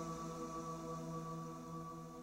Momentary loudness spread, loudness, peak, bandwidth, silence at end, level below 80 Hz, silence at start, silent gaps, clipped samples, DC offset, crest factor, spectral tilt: 3 LU; -47 LUFS; -32 dBFS; 16 kHz; 0 s; -66 dBFS; 0 s; none; under 0.1%; under 0.1%; 14 dB; -6 dB/octave